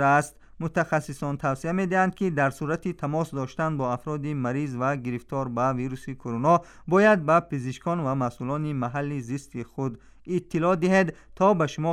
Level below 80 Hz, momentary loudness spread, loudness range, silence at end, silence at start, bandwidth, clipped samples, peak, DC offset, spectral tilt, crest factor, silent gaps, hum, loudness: -56 dBFS; 11 LU; 4 LU; 0 s; 0 s; 14 kHz; under 0.1%; -8 dBFS; under 0.1%; -7 dB/octave; 16 dB; none; none; -26 LUFS